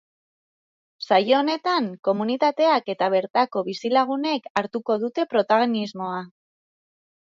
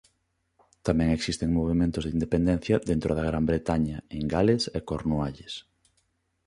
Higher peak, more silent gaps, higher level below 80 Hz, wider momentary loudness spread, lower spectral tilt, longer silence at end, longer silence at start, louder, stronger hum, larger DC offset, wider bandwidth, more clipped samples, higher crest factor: first, -4 dBFS vs -8 dBFS; first, 3.30-3.34 s, 4.50-4.55 s vs none; second, -72 dBFS vs -42 dBFS; about the same, 8 LU vs 9 LU; about the same, -5.5 dB/octave vs -6.5 dB/octave; first, 1 s vs 0.85 s; first, 1 s vs 0.85 s; first, -22 LUFS vs -27 LUFS; neither; neither; second, 7.6 kHz vs 11.5 kHz; neither; about the same, 18 dB vs 18 dB